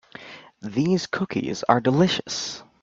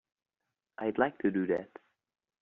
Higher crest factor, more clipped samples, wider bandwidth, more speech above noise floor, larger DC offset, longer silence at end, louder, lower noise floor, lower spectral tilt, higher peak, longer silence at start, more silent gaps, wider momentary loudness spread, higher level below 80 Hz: about the same, 22 dB vs 24 dB; neither; first, 7.8 kHz vs 3.9 kHz; second, 21 dB vs 57 dB; neither; second, 0.2 s vs 0.75 s; first, -23 LUFS vs -32 LUFS; second, -43 dBFS vs -88 dBFS; about the same, -5 dB/octave vs -6 dB/octave; first, -2 dBFS vs -12 dBFS; second, 0.15 s vs 0.8 s; neither; about the same, 20 LU vs 19 LU; first, -60 dBFS vs -74 dBFS